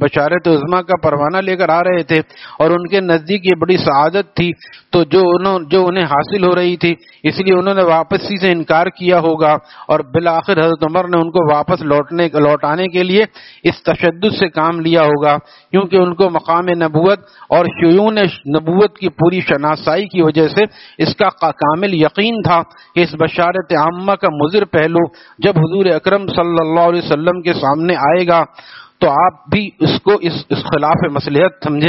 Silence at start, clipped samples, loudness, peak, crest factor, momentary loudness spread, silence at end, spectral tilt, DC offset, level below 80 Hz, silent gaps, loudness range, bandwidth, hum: 0 s; under 0.1%; -13 LUFS; 0 dBFS; 14 dB; 5 LU; 0 s; -4.5 dB/octave; under 0.1%; -50 dBFS; none; 1 LU; 6 kHz; none